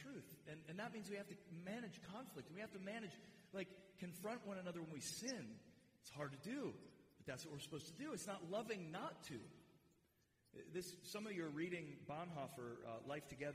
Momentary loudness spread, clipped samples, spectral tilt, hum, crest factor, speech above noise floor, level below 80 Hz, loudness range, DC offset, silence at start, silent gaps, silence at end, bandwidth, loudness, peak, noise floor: 10 LU; under 0.1%; -4.5 dB/octave; none; 18 dB; 29 dB; -84 dBFS; 2 LU; under 0.1%; 0 s; none; 0 s; 15.5 kHz; -51 LUFS; -34 dBFS; -80 dBFS